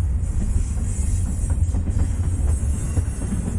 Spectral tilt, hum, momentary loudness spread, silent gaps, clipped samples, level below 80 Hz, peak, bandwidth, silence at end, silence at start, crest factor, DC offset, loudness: -7 dB/octave; none; 2 LU; none; under 0.1%; -24 dBFS; -8 dBFS; 11.5 kHz; 0 s; 0 s; 12 dB; under 0.1%; -24 LUFS